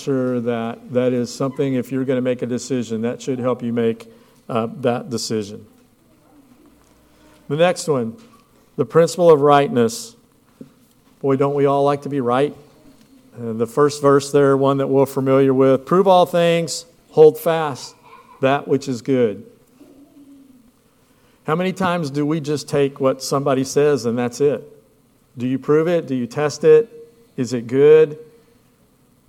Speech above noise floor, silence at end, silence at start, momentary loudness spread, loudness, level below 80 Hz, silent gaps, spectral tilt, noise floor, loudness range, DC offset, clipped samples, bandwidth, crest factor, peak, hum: 39 dB; 1.05 s; 0 s; 13 LU; -18 LUFS; -64 dBFS; none; -6 dB/octave; -56 dBFS; 9 LU; under 0.1%; under 0.1%; 16.5 kHz; 18 dB; 0 dBFS; none